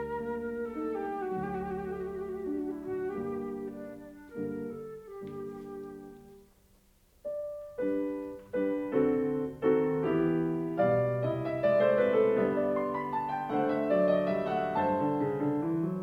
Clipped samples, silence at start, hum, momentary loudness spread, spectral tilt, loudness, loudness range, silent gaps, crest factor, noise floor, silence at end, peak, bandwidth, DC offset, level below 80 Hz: under 0.1%; 0 s; none; 15 LU; -9 dB/octave; -31 LUFS; 14 LU; none; 18 dB; -64 dBFS; 0 s; -14 dBFS; 15.5 kHz; under 0.1%; -62 dBFS